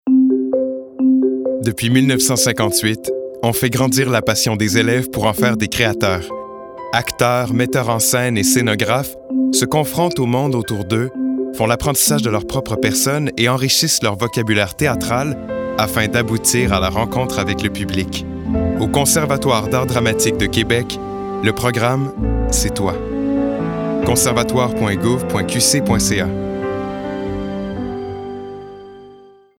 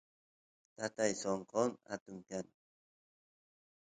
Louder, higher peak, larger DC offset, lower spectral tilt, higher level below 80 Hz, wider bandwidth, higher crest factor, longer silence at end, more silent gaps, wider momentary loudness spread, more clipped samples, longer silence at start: first, -17 LUFS vs -39 LUFS; first, 0 dBFS vs -18 dBFS; neither; about the same, -4 dB/octave vs -4 dB/octave; first, -34 dBFS vs -78 dBFS; first, over 20 kHz vs 9.4 kHz; second, 16 dB vs 24 dB; second, 0.4 s vs 1.4 s; second, none vs 2.01-2.06 s; about the same, 10 LU vs 11 LU; neither; second, 0.05 s vs 0.8 s